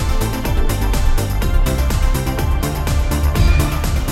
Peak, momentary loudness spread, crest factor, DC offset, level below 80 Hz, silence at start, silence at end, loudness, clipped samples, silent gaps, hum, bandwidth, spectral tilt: -2 dBFS; 4 LU; 14 dB; under 0.1%; -16 dBFS; 0 s; 0 s; -18 LUFS; under 0.1%; none; none; 16.5 kHz; -5.5 dB/octave